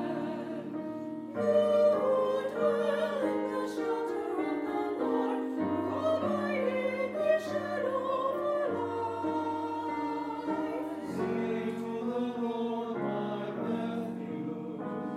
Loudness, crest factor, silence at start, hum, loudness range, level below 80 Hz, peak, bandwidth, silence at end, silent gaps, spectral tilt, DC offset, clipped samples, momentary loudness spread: -32 LUFS; 16 dB; 0 s; none; 5 LU; -76 dBFS; -16 dBFS; 14 kHz; 0 s; none; -7 dB/octave; under 0.1%; under 0.1%; 9 LU